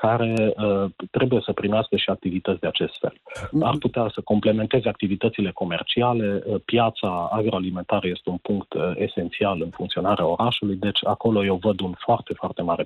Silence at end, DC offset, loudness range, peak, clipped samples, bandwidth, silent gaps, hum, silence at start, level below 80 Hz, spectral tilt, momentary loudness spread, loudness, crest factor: 0 s; under 0.1%; 2 LU; -10 dBFS; under 0.1%; 11.5 kHz; none; none; 0 s; -54 dBFS; -7.5 dB/octave; 6 LU; -23 LUFS; 14 dB